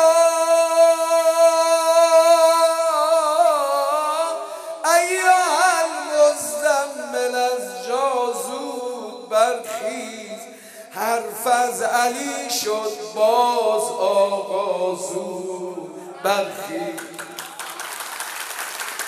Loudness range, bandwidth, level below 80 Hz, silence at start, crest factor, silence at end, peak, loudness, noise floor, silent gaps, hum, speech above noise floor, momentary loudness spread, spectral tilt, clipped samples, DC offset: 10 LU; 15.5 kHz; -82 dBFS; 0 s; 18 dB; 0 s; -2 dBFS; -19 LUFS; -40 dBFS; none; none; 18 dB; 15 LU; -1.5 dB/octave; under 0.1%; under 0.1%